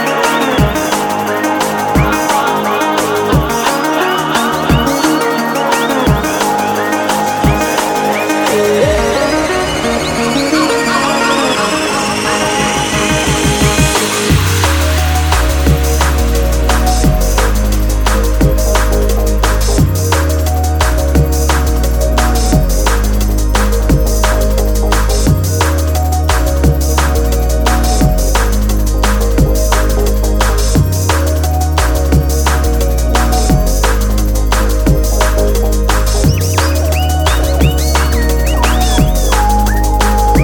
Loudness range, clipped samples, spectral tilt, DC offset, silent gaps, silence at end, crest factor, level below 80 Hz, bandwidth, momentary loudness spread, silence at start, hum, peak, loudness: 1 LU; under 0.1%; -4.5 dB/octave; under 0.1%; none; 0 s; 10 dB; -14 dBFS; 19.5 kHz; 2 LU; 0 s; none; 0 dBFS; -12 LUFS